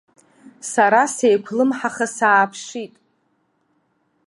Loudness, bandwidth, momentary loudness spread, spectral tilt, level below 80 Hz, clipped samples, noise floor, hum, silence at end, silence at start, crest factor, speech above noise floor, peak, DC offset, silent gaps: -18 LUFS; 11.5 kHz; 17 LU; -3.5 dB/octave; -76 dBFS; under 0.1%; -66 dBFS; none; 1.4 s; 0.45 s; 18 dB; 48 dB; -2 dBFS; under 0.1%; none